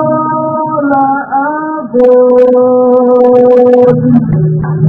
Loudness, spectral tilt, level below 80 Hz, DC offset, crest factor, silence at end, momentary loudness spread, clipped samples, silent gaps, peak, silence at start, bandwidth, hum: -8 LUFS; -11 dB/octave; -42 dBFS; under 0.1%; 8 dB; 0 s; 8 LU; 2%; none; 0 dBFS; 0 s; 3.6 kHz; none